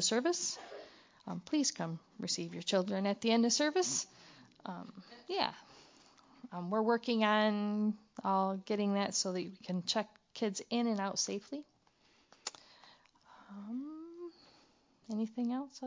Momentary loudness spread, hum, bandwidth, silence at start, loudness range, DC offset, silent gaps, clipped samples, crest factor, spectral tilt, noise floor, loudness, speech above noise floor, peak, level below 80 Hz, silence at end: 17 LU; none; 7.8 kHz; 0 s; 11 LU; under 0.1%; none; under 0.1%; 22 dB; -3.5 dB/octave; -70 dBFS; -35 LUFS; 35 dB; -16 dBFS; -84 dBFS; 0 s